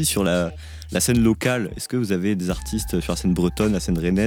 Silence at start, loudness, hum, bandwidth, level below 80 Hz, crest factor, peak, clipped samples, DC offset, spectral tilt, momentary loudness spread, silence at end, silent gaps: 0 s; -22 LUFS; none; 19 kHz; -36 dBFS; 14 dB; -6 dBFS; under 0.1%; under 0.1%; -5 dB/octave; 8 LU; 0 s; none